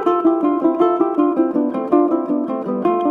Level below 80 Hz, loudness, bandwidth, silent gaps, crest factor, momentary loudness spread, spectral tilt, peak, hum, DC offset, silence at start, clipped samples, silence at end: -66 dBFS; -17 LUFS; 3.7 kHz; none; 14 dB; 4 LU; -9 dB/octave; -2 dBFS; none; under 0.1%; 0 s; under 0.1%; 0 s